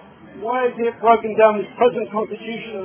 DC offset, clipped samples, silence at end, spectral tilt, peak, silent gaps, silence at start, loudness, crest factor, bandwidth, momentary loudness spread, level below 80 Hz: under 0.1%; under 0.1%; 0 s; -9 dB/octave; 0 dBFS; none; 0.25 s; -19 LUFS; 18 dB; 3.5 kHz; 12 LU; -60 dBFS